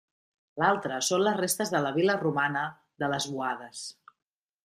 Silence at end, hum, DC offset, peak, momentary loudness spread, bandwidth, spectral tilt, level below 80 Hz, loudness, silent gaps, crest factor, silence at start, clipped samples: 0.75 s; none; under 0.1%; -10 dBFS; 12 LU; 15.5 kHz; -3.5 dB/octave; -72 dBFS; -28 LUFS; none; 20 dB; 0.55 s; under 0.1%